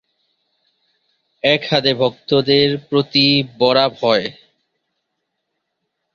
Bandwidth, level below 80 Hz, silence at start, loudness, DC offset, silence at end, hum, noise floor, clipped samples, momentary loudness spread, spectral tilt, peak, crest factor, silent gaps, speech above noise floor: 7 kHz; -58 dBFS; 1.45 s; -15 LUFS; under 0.1%; 1.85 s; none; -75 dBFS; under 0.1%; 6 LU; -6 dB/octave; 0 dBFS; 18 dB; none; 59 dB